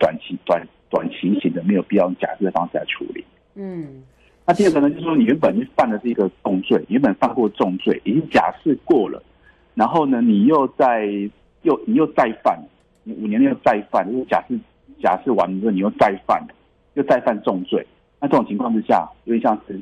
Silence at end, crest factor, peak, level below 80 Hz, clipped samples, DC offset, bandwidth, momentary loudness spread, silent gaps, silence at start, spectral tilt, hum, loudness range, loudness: 0 s; 14 dB; -4 dBFS; -56 dBFS; under 0.1%; under 0.1%; 11 kHz; 11 LU; none; 0 s; -7.5 dB/octave; none; 3 LU; -19 LUFS